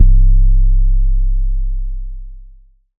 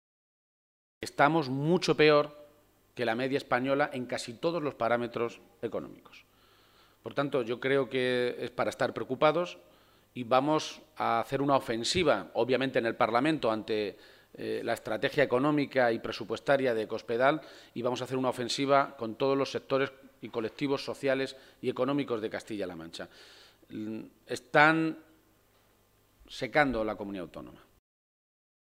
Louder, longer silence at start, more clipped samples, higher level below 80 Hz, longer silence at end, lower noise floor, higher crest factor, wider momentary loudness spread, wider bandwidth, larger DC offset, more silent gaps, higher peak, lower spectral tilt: first, -18 LUFS vs -30 LUFS; second, 0 s vs 1 s; neither; first, -12 dBFS vs -64 dBFS; second, 0.55 s vs 1.25 s; second, -42 dBFS vs -66 dBFS; second, 10 dB vs 24 dB; first, 18 LU vs 14 LU; second, 0.4 kHz vs 16 kHz; neither; neither; first, 0 dBFS vs -6 dBFS; first, -13.5 dB/octave vs -5 dB/octave